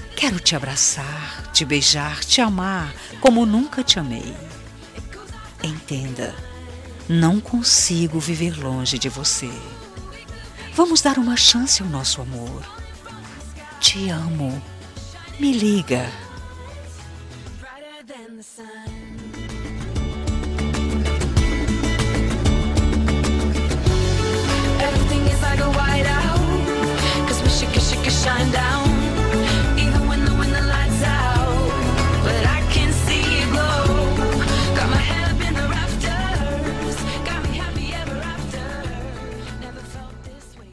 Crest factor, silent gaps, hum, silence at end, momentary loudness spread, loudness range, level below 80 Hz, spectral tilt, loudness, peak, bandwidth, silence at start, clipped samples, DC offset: 20 dB; none; none; 0 s; 20 LU; 9 LU; -26 dBFS; -4 dB/octave; -19 LUFS; 0 dBFS; 13 kHz; 0 s; under 0.1%; under 0.1%